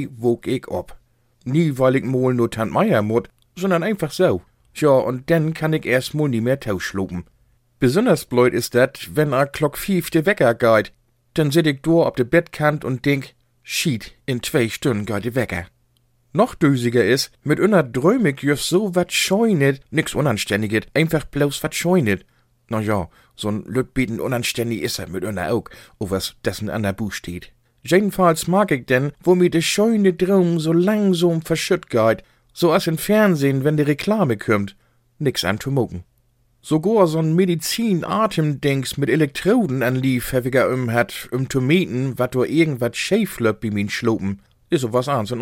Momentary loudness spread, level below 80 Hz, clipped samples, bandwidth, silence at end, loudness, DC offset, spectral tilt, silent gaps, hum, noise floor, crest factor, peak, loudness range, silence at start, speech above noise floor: 9 LU; -50 dBFS; under 0.1%; 17 kHz; 0 s; -19 LUFS; under 0.1%; -5.5 dB/octave; none; none; -61 dBFS; 18 dB; -2 dBFS; 5 LU; 0 s; 43 dB